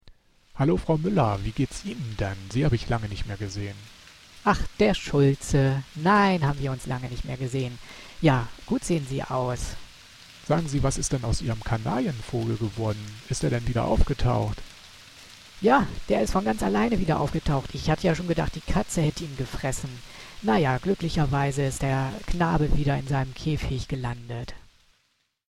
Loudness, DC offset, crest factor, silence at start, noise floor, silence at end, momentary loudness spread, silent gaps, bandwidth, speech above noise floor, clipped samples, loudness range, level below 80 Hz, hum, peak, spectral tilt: -26 LUFS; under 0.1%; 20 dB; 0.05 s; -71 dBFS; 0.9 s; 14 LU; none; 13.5 kHz; 46 dB; under 0.1%; 4 LU; -36 dBFS; none; -6 dBFS; -6 dB/octave